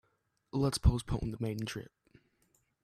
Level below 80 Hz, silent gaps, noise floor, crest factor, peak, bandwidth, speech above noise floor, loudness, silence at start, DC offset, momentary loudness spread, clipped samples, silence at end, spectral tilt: -42 dBFS; none; -78 dBFS; 22 dB; -12 dBFS; 14 kHz; 45 dB; -34 LUFS; 0.55 s; under 0.1%; 13 LU; under 0.1%; 1 s; -6 dB/octave